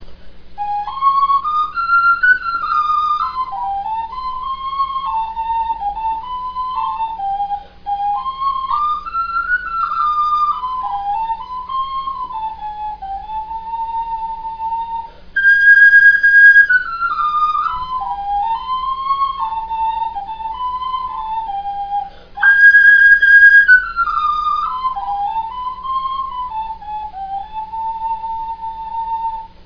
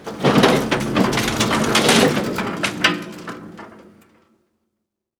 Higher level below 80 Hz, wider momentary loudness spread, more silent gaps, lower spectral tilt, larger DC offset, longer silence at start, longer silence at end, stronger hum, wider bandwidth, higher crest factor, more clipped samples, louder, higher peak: about the same, -42 dBFS vs -46 dBFS; about the same, 19 LU vs 19 LU; neither; second, -2.5 dB/octave vs -4 dB/octave; neither; about the same, 0 s vs 0 s; second, 0.2 s vs 1.5 s; neither; second, 5.4 kHz vs over 20 kHz; about the same, 16 dB vs 20 dB; neither; first, -14 LUFS vs -17 LUFS; about the same, 0 dBFS vs 0 dBFS